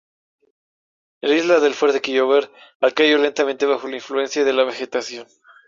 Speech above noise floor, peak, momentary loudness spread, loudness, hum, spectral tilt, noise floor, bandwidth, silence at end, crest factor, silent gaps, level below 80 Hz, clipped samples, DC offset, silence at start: over 71 dB; -2 dBFS; 11 LU; -19 LUFS; none; -2.5 dB/octave; under -90 dBFS; 7.6 kHz; 0.45 s; 18 dB; 2.75-2.80 s; -68 dBFS; under 0.1%; under 0.1%; 1.25 s